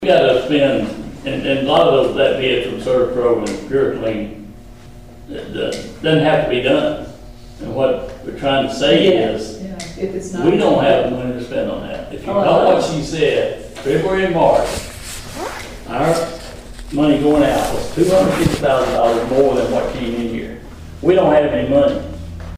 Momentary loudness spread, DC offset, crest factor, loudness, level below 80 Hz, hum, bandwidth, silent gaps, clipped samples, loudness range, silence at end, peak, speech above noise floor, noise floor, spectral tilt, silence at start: 15 LU; 0.6%; 14 dB; -16 LUFS; -36 dBFS; none; 16 kHz; none; under 0.1%; 4 LU; 0 s; -2 dBFS; 22 dB; -38 dBFS; -5.5 dB/octave; 0 s